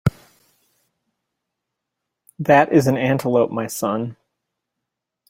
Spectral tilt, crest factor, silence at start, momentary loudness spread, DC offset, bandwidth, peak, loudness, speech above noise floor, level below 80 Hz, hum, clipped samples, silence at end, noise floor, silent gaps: -6.5 dB/octave; 20 dB; 0.05 s; 13 LU; under 0.1%; 16.5 kHz; -2 dBFS; -18 LUFS; 64 dB; -50 dBFS; none; under 0.1%; 1.15 s; -82 dBFS; none